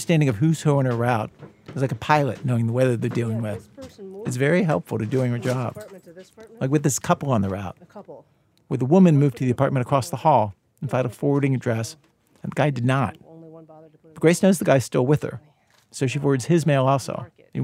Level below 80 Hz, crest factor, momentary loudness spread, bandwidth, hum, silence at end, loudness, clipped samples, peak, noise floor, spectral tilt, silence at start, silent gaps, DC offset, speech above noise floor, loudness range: -60 dBFS; 22 dB; 16 LU; 15.5 kHz; none; 0 s; -22 LUFS; under 0.1%; 0 dBFS; -48 dBFS; -6.5 dB/octave; 0 s; none; under 0.1%; 27 dB; 4 LU